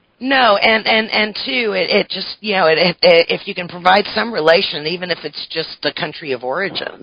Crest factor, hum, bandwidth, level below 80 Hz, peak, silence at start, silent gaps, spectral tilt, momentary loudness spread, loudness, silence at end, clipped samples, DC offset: 16 dB; none; 8 kHz; -56 dBFS; 0 dBFS; 0.2 s; none; -6 dB/octave; 11 LU; -15 LUFS; 0.05 s; under 0.1%; under 0.1%